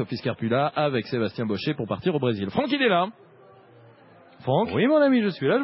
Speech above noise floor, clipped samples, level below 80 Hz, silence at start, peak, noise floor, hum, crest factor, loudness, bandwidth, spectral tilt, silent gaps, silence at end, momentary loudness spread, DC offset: 29 dB; under 0.1%; -58 dBFS; 0 s; -8 dBFS; -52 dBFS; none; 16 dB; -24 LUFS; 5.8 kHz; -11 dB/octave; none; 0 s; 8 LU; under 0.1%